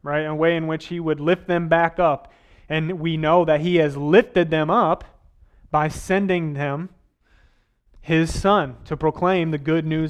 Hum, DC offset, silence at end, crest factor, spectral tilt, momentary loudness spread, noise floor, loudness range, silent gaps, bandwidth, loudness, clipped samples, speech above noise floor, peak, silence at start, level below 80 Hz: none; under 0.1%; 0 s; 18 dB; -6.5 dB/octave; 9 LU; -59 dBFS; 4 LU; none; 12 kHz; -21 LUFS; under 0.1%; 39 dB; -2 dBFS; 0.05 s; -44 dBFS